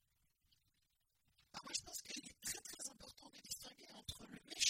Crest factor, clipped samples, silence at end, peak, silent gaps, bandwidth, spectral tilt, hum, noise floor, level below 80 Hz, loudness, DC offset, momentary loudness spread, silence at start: 28 dB; under 0.1%; 0 s; -22 dBFS; none; 16.5 kHz; 0 dB/octave; none; -84 dBFS; -74 dBFS; -49 LUFS; under 0.1%; 11 LU; 1.55 s